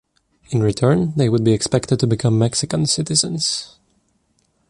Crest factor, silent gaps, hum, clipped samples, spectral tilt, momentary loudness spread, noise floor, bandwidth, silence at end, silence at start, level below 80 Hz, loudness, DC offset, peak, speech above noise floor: 16 dB; none; none; under 0.1%; -5 dB/octave; 4 LU; -64 dBFS; 11.5 kHz; 1.05 s; 0.5 s; -48 dBFS; -18 LUFS; under 0.1%; -2 dBFS; 47 dB